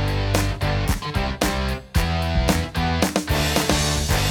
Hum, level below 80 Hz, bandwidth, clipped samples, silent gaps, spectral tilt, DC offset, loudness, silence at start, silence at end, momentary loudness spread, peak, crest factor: none; -28 dBFS; 19.5 kHz; under 0.1%; none; -4.5 dB/octave; under 0.1%; -22 LUFS; 0 s; 0 s; 4 LU; -2 dBFS; 18 dB